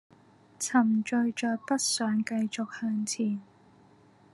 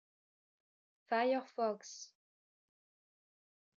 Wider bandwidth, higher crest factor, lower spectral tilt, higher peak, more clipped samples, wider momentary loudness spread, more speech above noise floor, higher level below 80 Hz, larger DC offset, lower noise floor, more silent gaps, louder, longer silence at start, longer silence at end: first, 12.5 kHz vs 7.6 kHz; about the same, 20 dB vs 20 dB; about the same, -3.5 dB/octave vs -3 dB/octave; first, -10 dBFS vs -22 dBFS; neither; second, 7 LU vs 17 LU; second, 31 dB vs over 53 dB; first, -82 dBFS vs under -90 dBFS; neither; second, -59 dBFS vs under -90 dBFS; neither; first, -29 LUFS vs -37 LUFS; second, 0.6 s vs 1.1 s; second, 0.9 s vs 1.75 s